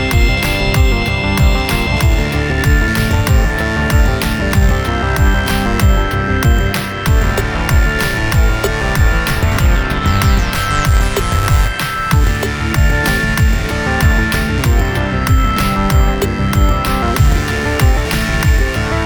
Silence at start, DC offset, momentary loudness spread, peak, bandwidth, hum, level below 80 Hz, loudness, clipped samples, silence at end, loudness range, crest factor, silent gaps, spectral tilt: 0 s; under 0.1%; 3 LU; 0 dBFS; over 20 kHz; none; -16 dBFS; -14 LUFS; under 0.1%; 0 s; 1 LU; 12 dB; none; -5 dB/octave